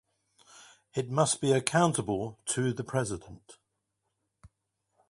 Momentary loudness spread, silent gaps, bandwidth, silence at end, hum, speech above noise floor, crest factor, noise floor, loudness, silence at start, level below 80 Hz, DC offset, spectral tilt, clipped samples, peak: 11 LU; none; 12 kHz; 0.65 s; none; 52 dB; 26 dB; -82 dBFS; -29 LUFS; 0.55 s; -62 dBFS; under 0.1%; -4.5 dB/octave; under 0.1%; -6 dBFS